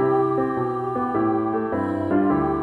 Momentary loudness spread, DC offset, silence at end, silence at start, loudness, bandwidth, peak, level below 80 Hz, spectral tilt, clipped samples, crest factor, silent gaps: 5 LU; under 0.1%; 0 s; 0 s; -22 LUFS; 4.4 kHz; -10 dBFS; -50 dBFS; -10 dB/octave; under 0.1%; 12 dB; none